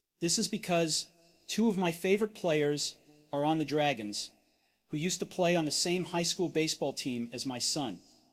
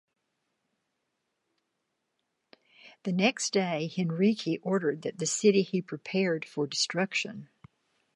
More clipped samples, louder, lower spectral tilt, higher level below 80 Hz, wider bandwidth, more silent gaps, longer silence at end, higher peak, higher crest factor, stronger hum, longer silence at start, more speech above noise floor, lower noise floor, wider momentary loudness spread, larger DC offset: neither; second, -32 LUFS vs -29 LUFS; about the same, -3.5 dB/octave vs -4.5 dB/octave; first, -70 dBFS vs -80 dBFS; first, 16 kHz vs 11.5 kHz; neither; second, 0.35 s vs 0.7 s; second, -16 dBFS vs -10 dBFS; second, 16 dB vs 22 dB; neither; second, 0.2 s vs 2.85 s; second, 41 dB vs 53 dB; second, -73 dBFS vs -81 dBFS; about the same, 8 LU vs 8 LU; neither